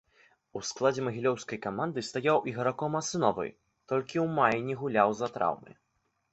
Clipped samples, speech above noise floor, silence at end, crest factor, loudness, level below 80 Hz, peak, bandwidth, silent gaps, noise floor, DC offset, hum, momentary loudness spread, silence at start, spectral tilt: under 0.1%; 36 dB; 0.6 s; 22 dB; -30 LUFS; -68 dBFS; -8 dBFS; 8.2 kHz; none; -65 dBFS; under 0.1%; none; 10 LU; 0.55 s; -5 dB/octave